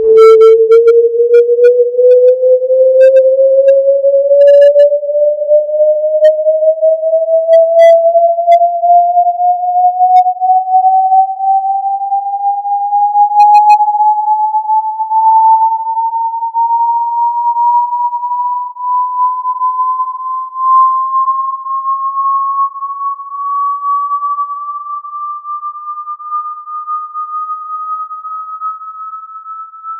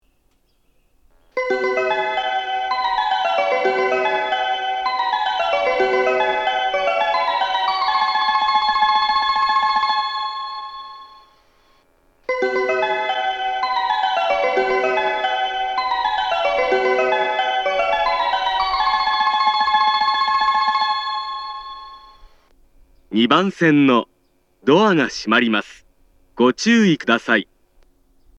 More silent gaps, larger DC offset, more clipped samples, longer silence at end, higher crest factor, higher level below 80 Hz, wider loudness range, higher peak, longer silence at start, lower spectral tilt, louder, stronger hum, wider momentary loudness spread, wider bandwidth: neither; neither; neither; second, 0 s vs 0.95 s; second, 10 dB vs 20 dB; second, -68 dBFS vs -54 dBFS; first, 12 LU vs 5 LU; about the same, 0 dBFS vs 0 dBFS; second, 0 s vs 1.35 s; second, -2.5 dB/octave vs -4.5 dB/octave; first, -10 LUFS vs -18 LUFS; neither; first, 15 LU vs 8 LU; second, 7.8 kHz vs 9.8 kHz